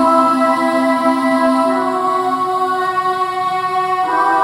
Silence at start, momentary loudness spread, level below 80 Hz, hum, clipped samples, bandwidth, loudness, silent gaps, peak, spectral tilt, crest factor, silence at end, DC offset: 0 s; 4 LU; -60 dBFS; none; under 0.1%; 16 kHz; -15 LUFS; none; -2 dBFS; -4.5 dB/octave; 14 dB; 0 s; under 0.1%